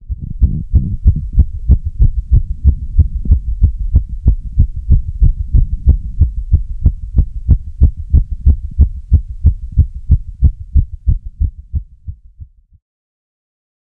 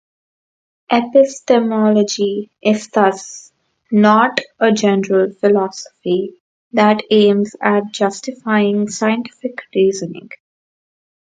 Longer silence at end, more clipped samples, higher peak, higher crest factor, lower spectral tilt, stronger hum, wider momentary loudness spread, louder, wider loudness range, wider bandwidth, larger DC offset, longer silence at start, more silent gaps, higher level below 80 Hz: first, 1.55 s vs 1.15 s; neither; about the same, 0 dBFS vs 0 dBFS; about the same, 14 dB vs 16 dB; first, -13 dB/octave vs -5 dB/octave; neither; second, 6 LU vs 13 LU; about the same, -16 LUFS vs -15 LUFS; about the same, 4 LU vs 3 LU; second, 0.9 kHz vs 9.2 kHz; neither; second, 0.05 s vs 0.9 s; second, none vs 6.40-6.71 s; first, -14 dBFS vs -66 dBFS